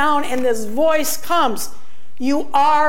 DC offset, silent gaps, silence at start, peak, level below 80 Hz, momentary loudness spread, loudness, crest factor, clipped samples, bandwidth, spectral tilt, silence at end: 10%; none; 0 s; -4 dBFS; -54 dBFS; 8 LU; -19 LUFS; 14 dB; under 0.1%; 17 kHz; -3 dB/octave; 0 s